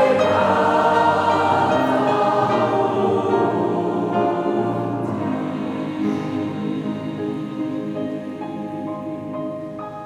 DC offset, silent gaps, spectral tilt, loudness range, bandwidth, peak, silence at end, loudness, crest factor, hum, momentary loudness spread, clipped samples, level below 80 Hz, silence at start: under 0.1%; none; -7 dB/octave; 9 LU; 13 kHz; -4 dBFS; 0 s; -21 LUFS; 16 dB; none; 12 LU; under 0.1%; -60 dBFS; 0 s